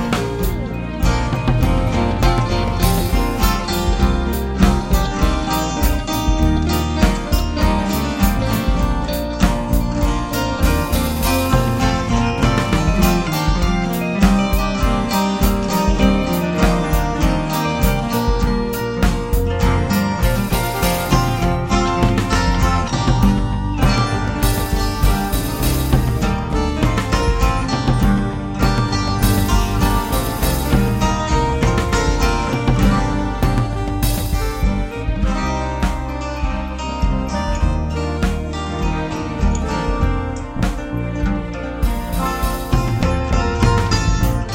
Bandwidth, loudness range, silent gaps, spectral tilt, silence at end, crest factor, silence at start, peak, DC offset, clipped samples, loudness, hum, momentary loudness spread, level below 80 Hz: 17 kHz; 4 LU; none; -5.5 dB/octave; 0 s; 16 dB; 0 s; 0 dBFS; under 0.1%; under 0.1%; -18 LUFS; none; 5 LU; -20 dBFS